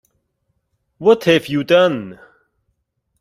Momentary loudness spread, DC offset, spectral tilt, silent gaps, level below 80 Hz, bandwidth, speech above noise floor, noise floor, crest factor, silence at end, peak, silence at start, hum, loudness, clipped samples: 11 LU; under 0.1%; -5.5 dB/octave; none; -58 dBFS; 15 kHz; 56 dB; -70 dBFS; 18 dB; 1.1 s; -2 dBFS; 1 s; none; -15 LUFS; under 0.1%